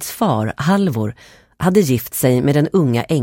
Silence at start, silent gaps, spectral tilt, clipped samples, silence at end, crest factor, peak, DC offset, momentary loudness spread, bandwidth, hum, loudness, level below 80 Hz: 0 s; none; -6.5 dB/octave; under 0.1%; 0 s; 14 dB; -2 dBFS; under 0.1%; 6 LU; 17 kHz; none; -17 LUFS; -48 dBFS